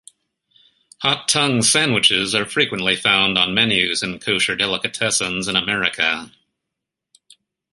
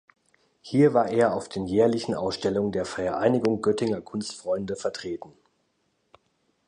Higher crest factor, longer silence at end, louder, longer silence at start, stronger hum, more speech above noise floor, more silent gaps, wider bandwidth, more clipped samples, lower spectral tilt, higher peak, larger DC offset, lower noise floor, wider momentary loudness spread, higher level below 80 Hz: about the same, 20 dB vs 18 dB; about the same, 1.45 s vs 1.35 s; first, -17 LUFS vs -25 LUFS; first, 1 s vs 0.65 s; neither; first, 63 dB vs 47 dB; neither; first, 12 kHz vs 10.5 kHz; neither; second, -2 dB/octave vs -6 dB/octave; first, 0 dBFS vs -8 dBFS; neither; first, -82 dBFS vs -72 dBFS; second, 6 LU vs 11 LU; about the same, -54 dBFS vs -58 dBFS